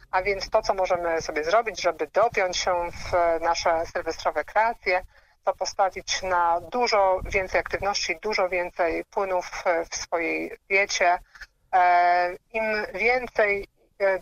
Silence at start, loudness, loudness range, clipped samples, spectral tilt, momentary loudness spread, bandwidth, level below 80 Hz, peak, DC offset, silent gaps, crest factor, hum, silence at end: 0.15 s; -24 LUFS; 2 LU; under 0.1%; -2.5 dB/octave; 6 LU; 15 kHz; -48 dBFS; -8 dBFS; under 0.1%; none; 16 dB; none; 0 s